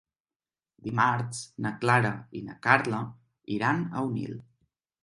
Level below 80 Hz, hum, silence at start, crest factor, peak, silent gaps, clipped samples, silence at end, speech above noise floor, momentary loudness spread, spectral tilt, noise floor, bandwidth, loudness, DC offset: -66 dBFS; none; 0.85 s; 26 dB; -4 dBFS; none; under 0.1%; 0.65 s; over 62 dB; 16 LU; -6 dB/octave; under -90 dBFS; 11.5 kHz; -28 LUFS; under 0.1%